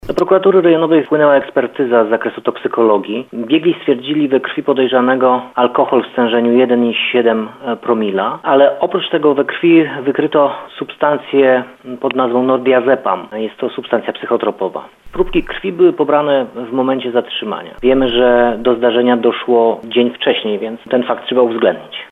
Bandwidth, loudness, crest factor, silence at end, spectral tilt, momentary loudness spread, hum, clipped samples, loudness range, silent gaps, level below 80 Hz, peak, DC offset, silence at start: 5.6 kHz; -14 LUFS; 14 dB; 0.05 s; -7.5 dB/octave; 9 LU; none; under 0.1%; 3 LU; none; -42 dBFS; 0 dBFS; under 0.1%; 0.05 s